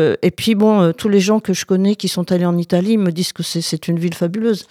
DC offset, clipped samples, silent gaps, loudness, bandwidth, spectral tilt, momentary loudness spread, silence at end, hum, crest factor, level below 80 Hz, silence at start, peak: under 0.1%; under 0.1%; none; -16 LUFS; 15.5 kHz; -6 dB/octave; 7 LU; 0.1 s; none; 14 dB; -58 dBFS; 0 s; -2 dBFS